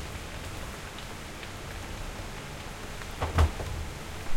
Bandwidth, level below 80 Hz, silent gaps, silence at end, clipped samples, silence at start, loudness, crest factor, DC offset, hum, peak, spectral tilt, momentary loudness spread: 16.5 kHz; -40 dBFS; none; 0 s; under 0.1%; 0 s; -35 LUFS; 22 dB; under 0.1%; none; -10 dBFS; -4.5 dB/octave; 12 LU